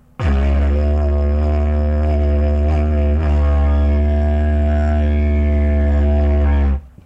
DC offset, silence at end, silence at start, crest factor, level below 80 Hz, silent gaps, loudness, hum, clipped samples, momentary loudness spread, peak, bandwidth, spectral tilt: under 0.1%; 0.2 s; 0.2 s; 8 dB; -16 dBFS; none; -17 LUFS; none; under 0.1%; 2 LU; -6 dBFS; 3.6 kHz; -9.5 dB/octave